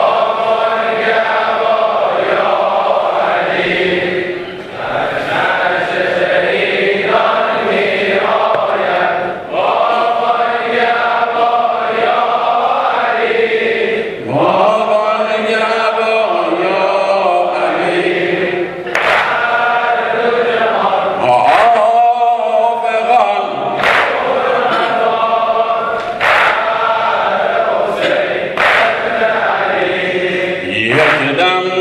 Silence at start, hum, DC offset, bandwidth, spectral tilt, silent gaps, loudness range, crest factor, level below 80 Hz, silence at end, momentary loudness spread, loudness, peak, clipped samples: 0 s; none; under 0.1%; 11.5 kHz; -4.5 dB/octave; none; 2 LU; 12 dB; -54 dBFS; 0 s; 4 LU; -13 LUFS; 0 dBFS; under 0.1%